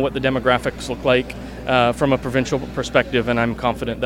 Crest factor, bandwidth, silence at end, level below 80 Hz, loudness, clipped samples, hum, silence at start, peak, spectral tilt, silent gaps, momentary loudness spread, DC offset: 20 dB; 16.5 kHz; 0 s; -38 dBFS; -20 LUFS; under 0.1%; none; 0 s; 0 dBFS; -5.5 dB/octave; none; 6 LU; under 0.1%